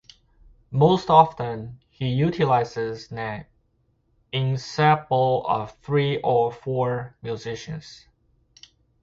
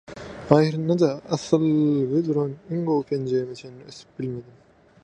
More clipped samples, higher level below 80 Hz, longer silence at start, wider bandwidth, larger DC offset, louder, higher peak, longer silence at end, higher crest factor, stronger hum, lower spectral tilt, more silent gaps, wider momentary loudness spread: neither; first, -54 dBFS vs -60 dBFS; first, 0.7 s vs 0.1 s; second, 7.6 kHz vs 9 kHz; neither; about the same, -23 LUFS vs -23 LUFS; about the same, -2 dBFS vs 0 dBFS; first, 1.05 s vs 0.6 s; about the same, 22 dB vs 24 dB; neither; about the same, -7 dB/octave vs -7.5 dB/octave; neither; second, 15 LU vs 19 LU